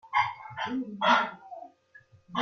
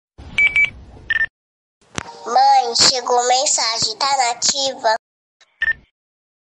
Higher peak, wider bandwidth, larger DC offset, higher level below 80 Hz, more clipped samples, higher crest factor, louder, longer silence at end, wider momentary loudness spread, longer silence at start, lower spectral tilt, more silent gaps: second, -10 dBFS vs -2 dBFS; second, 7 kHz vs 11.5 kHz; neither; second, -76 dBFS vs -50 dBFS; neither; about the same, 20 dB vs 18 dB; second, -28 LUFS vs -16 LUFS; second, 0 s vs 0.65 s; first, 21 LU vs 11 LU; second, 0.05 s vs 0.2 s; first, -4 dB/octave vs 0.5 dB/octave; second, none vs 1.30-1.81 s, 4.99-5.40 s